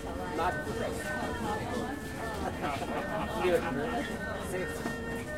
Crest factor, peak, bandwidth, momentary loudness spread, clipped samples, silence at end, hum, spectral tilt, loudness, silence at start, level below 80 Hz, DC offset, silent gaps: 18 dB; -16 dBFS; 16 kHz; 6 LU; under 0.1%; 0 s; none; -5 dB/octave; -34 LUFS; 0 s; -48 dBFS; 0.2%; none